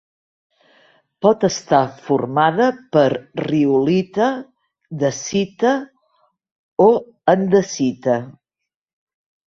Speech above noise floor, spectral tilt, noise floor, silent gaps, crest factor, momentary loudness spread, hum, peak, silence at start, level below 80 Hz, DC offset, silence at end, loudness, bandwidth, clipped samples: 66 dB; -5.5 dB/octave; -83 dBFS; 6.52-6.77 s; 18 dB; 8 LU; none; -2 dBFS; 1.2 s; -60 dBFS; under 0.1%; 1.15 s; -18 LUFS; 7.6 kHz; under 0.1%